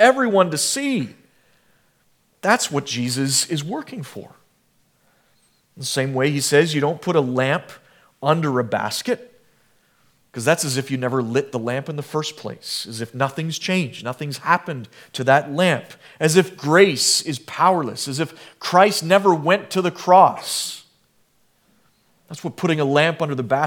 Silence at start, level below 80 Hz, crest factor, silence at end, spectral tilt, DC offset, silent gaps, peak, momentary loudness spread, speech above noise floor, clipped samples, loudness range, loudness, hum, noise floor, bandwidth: 0 s; -72 dBFS; 20 dB; 0 s; -4 dB/octave; under 0.1%; none; 0 dBFS; 14 LU; 43 dB; under 0.1%; 7 LU; -20 LUFS; none; -63 dBFS; 18.5 kHz